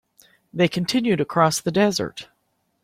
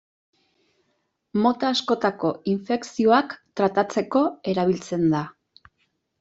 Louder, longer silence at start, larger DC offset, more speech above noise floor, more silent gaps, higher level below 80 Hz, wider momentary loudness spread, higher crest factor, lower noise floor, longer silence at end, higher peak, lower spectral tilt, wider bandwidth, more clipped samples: about the same, -21 LUFS vs -23 LUFS; second, 0.55 s vs 1.35 s; neither; about the same, 50 dB vs 50 dB; neither; first, -58 dBFS vs -64 dBFS; first, 12 LU vs 8 LU; about the same, 20 dB vs 20 dB; about the same, -70 dBFS vs -73 dBFS; second, 0.6 s vs 0.9 s; about the same, -4 dBFS vs -4 dBFS; about the same, -5 dB/octave vs -6 dB/octave; first, 16.5 kHz vs 8 kHz; neither